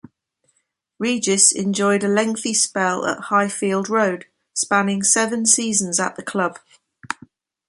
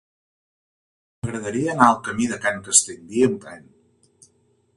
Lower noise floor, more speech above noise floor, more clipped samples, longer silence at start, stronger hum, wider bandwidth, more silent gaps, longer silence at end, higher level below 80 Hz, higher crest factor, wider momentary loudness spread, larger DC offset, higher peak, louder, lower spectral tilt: first, -70 dBFS vs -63 dBFS; first, 50 dB vs 42 dB; neither; second, 1 s vs 1.25 s; neither; about the same, 11.5 kHz vs 11.5 kHz; neither; second, 0.55 s vs 1.15 s; second, -66 dBFS vs -56 dBFS; about the same, 20 dB vs 24 dB; second, 12 LU vs 15 LU; neither; about the same, 0 dBFS vs 0 dBFS; about the same, -18 LUFS vs -20 LUFS; about the same, -2.5 dB/octave vs -3 dB/octave